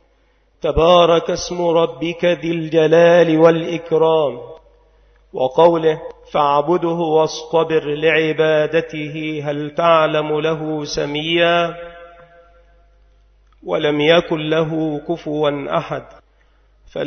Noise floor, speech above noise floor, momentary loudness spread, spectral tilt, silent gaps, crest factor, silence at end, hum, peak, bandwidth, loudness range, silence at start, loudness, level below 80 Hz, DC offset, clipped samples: -57 dBFS; 41 dB; 12 LU; -5.5 dB/octave; none; 18 dB; 0 s; none; 0 dBFS; 6.6 kHz; 5 LU; 0.65 s; -16 LUFS; -44 dBFS; under 0.1%; under 0.1%